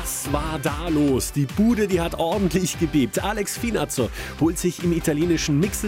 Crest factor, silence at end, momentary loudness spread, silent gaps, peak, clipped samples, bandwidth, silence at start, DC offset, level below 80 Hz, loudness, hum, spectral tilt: 14 dB; 0 s; 5 LU; none; -8 dBFS; under 0.1%; 17 kHz; 0 s; under 0.1%; -36 dBFS; -22 LUFS; none; -5 dB/octave